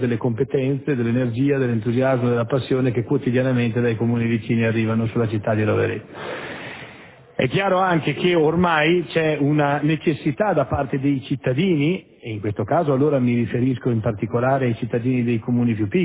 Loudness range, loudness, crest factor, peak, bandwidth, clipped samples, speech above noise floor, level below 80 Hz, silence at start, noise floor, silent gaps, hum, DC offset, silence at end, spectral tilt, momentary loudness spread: 3 LU; -21 LUFS; 14 dB; -6 dBFS; 4 kHz; under 0.1%; 24 dB; -50 dBFS; 0 s; -44 dBFS; none; none; under 0.1%; 0 s; -11.5 dB/octave; 7 LU